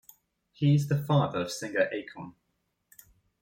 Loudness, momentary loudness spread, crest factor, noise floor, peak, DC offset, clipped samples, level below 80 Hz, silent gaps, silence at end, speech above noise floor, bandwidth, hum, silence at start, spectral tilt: -28 LUFS; 18 LU; 18 dB; -78 dBFS; -12 dBFS; under 0.1%; under 0.1%; -66 dBFS; none; 1.1 s; 50 dB; 16.5 kHz; none; 0.6 s; -6.5 dB/octave